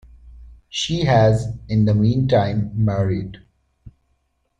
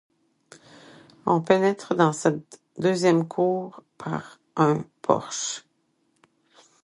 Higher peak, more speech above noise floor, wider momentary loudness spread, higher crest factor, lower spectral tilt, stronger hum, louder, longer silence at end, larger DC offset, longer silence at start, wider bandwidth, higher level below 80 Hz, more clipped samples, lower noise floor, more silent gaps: about the same, -4 dBFS vs -2 dBFS; first, 50 dB vs 46 dB; second, 10 LU vs 14 LU; second, 16 dB vs 22 dB; first, -7 dB/octave vs -5.5 dB/octave; neither; first, -19 LUFS vs -24 LUFS; second, 0.7 s vs 1.25 s; neither; second, 0.25 s vs 1.25 s; second, 9 kHz vs 11.5 kHz; first, -42 dBFS vs -68 dBFS; neither; about the same, -67 dBFS vs -70 dBFS; neither